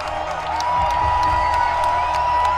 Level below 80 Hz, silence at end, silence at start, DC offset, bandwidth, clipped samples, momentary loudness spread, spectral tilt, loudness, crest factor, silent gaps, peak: -34 dBFS; 0 s; 0 s; under 0.1%; 12.5 kHz; under 0.1%; 6 LU; -4 dB/octave; -19 LUFS; 12 dB; none; -6 dBFS